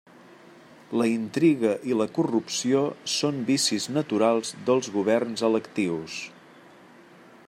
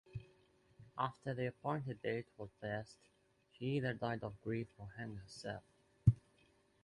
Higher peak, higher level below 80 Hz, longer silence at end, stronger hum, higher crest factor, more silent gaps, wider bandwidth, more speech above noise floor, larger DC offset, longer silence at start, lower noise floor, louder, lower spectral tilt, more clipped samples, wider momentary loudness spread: first, -10 dBFS vs -16 dBFS; second, -74 dBFS vs -58 dBFS; first, 1.15 s vs 0.65 s; neither; second, 16 dB vs 26 dB; neither; first, 16 kHz vs 11 kHz; second, 26 dB vs 30 dB; neither; first, 0.7 s vs 0.1 s; second, -51 dBFS vs -73 dBFS; first, -25 LUFS vs -42 LUFS; second, -4.5 dB/octave vs -7.5 dB/octave; neither; second, 6 LU vs 16 LU